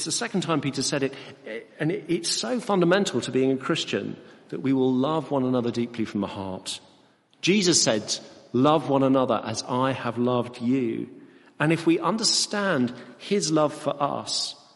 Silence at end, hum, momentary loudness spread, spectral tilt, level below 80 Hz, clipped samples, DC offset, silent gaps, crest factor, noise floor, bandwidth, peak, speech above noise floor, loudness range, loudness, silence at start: 0.25 s; none; 11 LU; -4 dB/octave; -68 dBFS; under 0.1%; under 0.1%; none; 18 dB; -59 dBFS; 11.5 kHz; -6 dBFS; 34 dB; 3 LU; -24 LUFS; 0 s